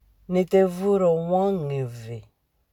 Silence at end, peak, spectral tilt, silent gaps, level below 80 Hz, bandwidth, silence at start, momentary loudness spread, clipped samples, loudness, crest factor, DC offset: 0.5 s; -8 dBFS; -8 dB/octave; none; -58 dBFS; 14.5 kHz; 0.3 s; 17 LU; under 0.1%; -23 LUFS; 16 dB; under 0.1%